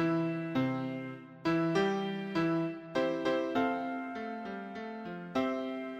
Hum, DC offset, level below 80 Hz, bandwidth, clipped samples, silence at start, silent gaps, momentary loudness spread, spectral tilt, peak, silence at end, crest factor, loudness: none; under 0.1%; -70 dBFS; 8.4 kHz; under 0.1%; 0 s; none; 11 LU; -7 dB/octave; -18 dBFS; 0 s; 16 dB; -34 LUFS